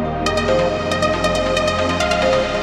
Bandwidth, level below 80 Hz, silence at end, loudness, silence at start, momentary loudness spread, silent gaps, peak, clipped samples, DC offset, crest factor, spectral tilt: 14 kHz; -34 dBFS; 0 s; -17 LUFS; 0 s; 2 LU; none; -2 dBFS; under 0.1%; under 0.1%; 16 dB; -4.5 dB/octave